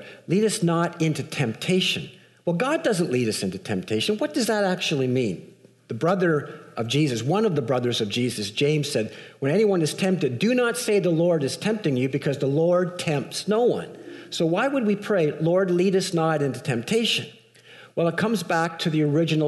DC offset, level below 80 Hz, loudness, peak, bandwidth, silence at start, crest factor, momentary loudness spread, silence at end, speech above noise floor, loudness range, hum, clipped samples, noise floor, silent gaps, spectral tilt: under 0.1%; -68 dBFS; -23 LUFS; -12 dBFS; 12 kHz; 0 s; 12 dB; 7 LU; 0 s; 26 dB; 2 LU; none; under 0.1%; -49 dBFS; none; -5.5 dB/octave